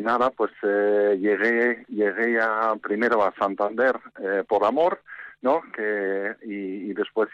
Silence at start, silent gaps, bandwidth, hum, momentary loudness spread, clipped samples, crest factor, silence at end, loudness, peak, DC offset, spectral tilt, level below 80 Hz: 0 s; none; 7.4 kHz; none; 9 LU; under 0.1%; 12 dB; 0.05 s; -24 LUFS; -10 dBFS; under 0.1%; -6.5 dB/octave; -70 dBFS